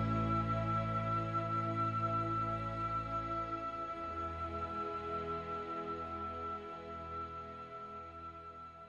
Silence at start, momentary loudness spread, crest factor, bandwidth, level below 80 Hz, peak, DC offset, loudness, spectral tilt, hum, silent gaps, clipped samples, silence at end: 0 s; 12 LU; 16 dB; 7.2 kHz; -56 dBFS; -24 dBFS; under 0.1%; -39 LUFS; -8 dB/octave; none; none; under 0.1%; 0 s